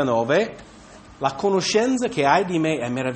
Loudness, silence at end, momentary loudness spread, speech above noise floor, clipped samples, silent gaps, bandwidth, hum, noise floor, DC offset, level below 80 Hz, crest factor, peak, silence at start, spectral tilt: -21 LUFS; 0 s; 7 LU; 24 dB; under 0.1%; none; 8.8 kHz; none; -45 dBFS; under 0.1%; -56 dBFS; 18 dB; -2 dBFS; 0 s; -4.5 dB/octave